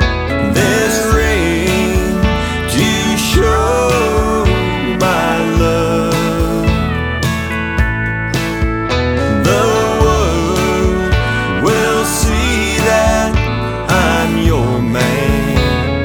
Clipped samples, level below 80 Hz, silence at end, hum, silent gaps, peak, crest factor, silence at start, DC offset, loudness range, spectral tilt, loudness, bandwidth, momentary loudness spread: under 0.1%; -22 dBFS; 0 s; none; none; 0 dBFS; 12 dB; 0 s; under 0.1%; 2 LU; -5 dB/octave; -14 LUFS; 18.5 kHz; 4 LU